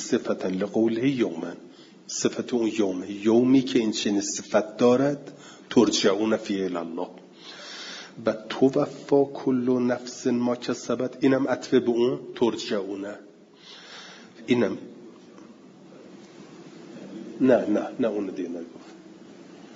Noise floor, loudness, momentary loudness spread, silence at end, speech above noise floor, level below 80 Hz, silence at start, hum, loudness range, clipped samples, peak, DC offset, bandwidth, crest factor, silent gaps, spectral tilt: -49 dBFS; -25 LUFS; 22 LU; 0 s; 24 dB; -72 dBFS; 0 s; none; 9 LU; under 0.1%; -6 dBFS; under 0.1%; 7.8 kHz; 20 dB; none; -5 dB/octave